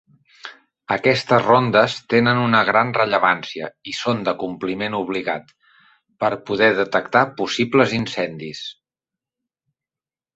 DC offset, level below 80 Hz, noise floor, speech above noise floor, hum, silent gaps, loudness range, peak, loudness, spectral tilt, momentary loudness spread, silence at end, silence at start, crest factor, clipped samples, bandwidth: under 0.1%; -60 dBFS; under -90 dBFS; over 71 dB; none; none; 6 LU; -2 dBFS; -19 LUFS; -5.5 dB/octave; 15 LU; 1.65 s; 0.45 s; 20 dB; under 0.1%; 8.2 kHz